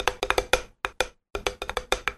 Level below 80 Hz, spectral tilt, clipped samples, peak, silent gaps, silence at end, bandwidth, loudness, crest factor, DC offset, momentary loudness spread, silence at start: -42 dBFS; -2 dB/octave; under 0.1%; -4 dBFS; none; 0 s; 13.5 kHz; -28 LUFS; 24 dB; under 0.1%; 8 LU; 0 s